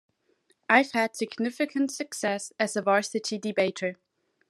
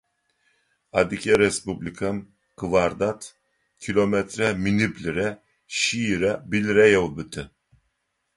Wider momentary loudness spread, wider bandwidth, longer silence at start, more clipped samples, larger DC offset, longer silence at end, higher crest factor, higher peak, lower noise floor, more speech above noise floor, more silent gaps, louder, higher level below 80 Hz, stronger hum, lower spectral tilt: second, 9 LU vs 16 LU; first, 13 kHz vs 11.5 kHz; second, 0.7 s vs 0.95 s; neither; neither; second, 0.55 s vs 0.9 s; about the same, 22 dB vs 20 dB; about the same, -6 dBFS vs -4 dBFS; second, -69 dBFS vs -75 dBFS; second, 42 dB vs 52 dB; neither; second, -27 LUFS vs -23 LUFS; second, -84 dBFS vs -50 dBFS; neither; about the same, -3.5 dB/octave vs -4.5 dB/octave